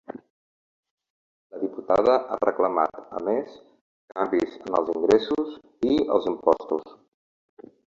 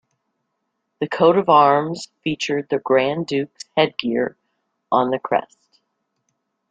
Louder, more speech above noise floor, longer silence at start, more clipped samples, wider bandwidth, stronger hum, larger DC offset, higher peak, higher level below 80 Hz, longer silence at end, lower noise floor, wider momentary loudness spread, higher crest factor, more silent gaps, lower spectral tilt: second, -24 LUFS vs -19 LUFS; first, over 66 dB vs 56 dB; second, 0.1 s vs 1 s; neither; second, 7.6 kHz vs 9.2 kHz; neither; neither; second, -6 dBFS vs -2 dBFS; first, -60 dBFS vs -66 dBFS; second, 1 s vs 1.25 s; first, under -90 dBFS vs -75 dBFS; about the same, 13 LU vs 13 LU; about the same, 20 dB vs 20 dB; first, 0.30-0.83 s, 0.91-0.98 s, 1.10-1.50 s, 3.81-4.08 s vs none; about the same, -6 dB/octave vs -5.5 dB/octave